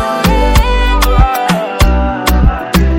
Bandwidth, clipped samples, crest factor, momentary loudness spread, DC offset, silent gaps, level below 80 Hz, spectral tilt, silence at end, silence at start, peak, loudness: 17 kHz; under 0.1%; 10 dB; 3 LU; under 0.1%; none; -12 dBFS; -5.5 dB/octave; 0 s; 0 s; 0 dBFS; -12 LUFS